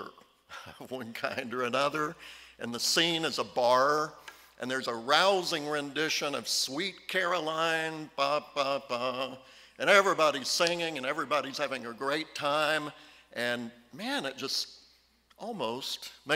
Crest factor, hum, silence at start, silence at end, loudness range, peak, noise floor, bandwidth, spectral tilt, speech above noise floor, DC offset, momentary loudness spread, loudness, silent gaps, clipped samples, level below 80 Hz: 24 dB; none; 0 s; 0 s; 5 LU; -6 dBFS; -65 dBFS; 16 kHz; -2.5 dB/octave; 34 dB; under 0.1%; 17 LU; -30 LUFS; none; under 0.1%; -74 dBFS